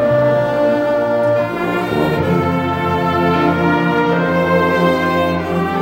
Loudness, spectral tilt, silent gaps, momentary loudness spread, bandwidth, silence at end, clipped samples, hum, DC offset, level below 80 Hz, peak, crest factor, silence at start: -15 LUFS; -7.5 dB/octave; none; 3 LU; 16 kHz; 0 s; under 0.1%; none; under 0.1%; -46 dBFS; -2 dBFS; 12 dB; 0 s